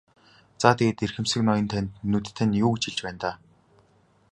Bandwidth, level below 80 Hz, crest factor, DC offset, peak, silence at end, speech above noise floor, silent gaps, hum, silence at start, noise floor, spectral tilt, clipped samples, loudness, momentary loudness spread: 11 kHz; -52 dBFS; 26 dB; under 0.1%; -2 dBFS; 0.95 s; 37 dB; none; none; 0.6 s; -62 dBFS; -5.5 dB/octave; under 0.1%; -25 LUFS; 9 LU